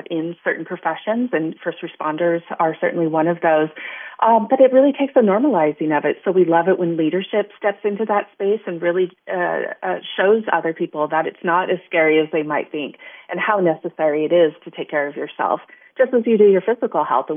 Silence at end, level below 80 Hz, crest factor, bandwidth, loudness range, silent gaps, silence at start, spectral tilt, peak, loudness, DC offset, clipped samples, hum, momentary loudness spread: 0 s; -80 dBFS; 18 dB; 3.7 kHz; 4 LU; none; 0.1 s; -10.5 dB/octave; 0 dBFS; -19 LUFS; under 0.1%; under 0.1%; none; 10 LU